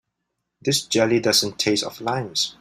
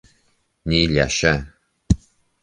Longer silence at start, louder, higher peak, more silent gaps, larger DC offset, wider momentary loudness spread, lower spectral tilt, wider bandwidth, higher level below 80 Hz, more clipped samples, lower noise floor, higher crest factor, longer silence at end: about the same, 0.65 s vs 0.65 s; about the same, -21 LUFS vs -20 LUFS; about the same, -4 dBFS vs -2 dBFS; neither; neither; about the same, 8 LU vs 7 LU; second, -3 dB/octave vs -4.5 dB/octave; first, 16 kHz vs 10 kHz; second, -60 dBFS vs -32 dBFS; neither; first, -79 dBFS vs -64 dBFS; about the same, 18 dB vs 20 dB; second, 0.1 s vs 0.45 s